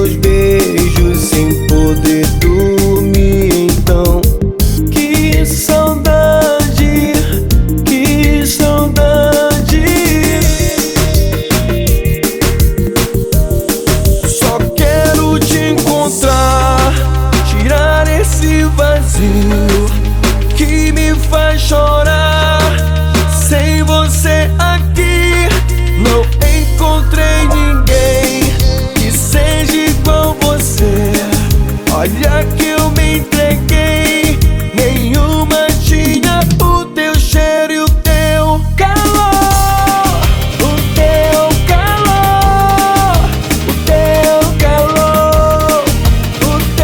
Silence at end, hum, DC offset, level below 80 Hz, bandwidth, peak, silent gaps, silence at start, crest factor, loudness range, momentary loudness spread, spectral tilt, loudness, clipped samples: 0 s; none; under 0.1%; -14 dBFS; over 20 kHz; 0 dBFS; none; 0 s; 10 dB; 1 LU; 3 LU; -5 dB/octave; -11 LUFS; under 0.1%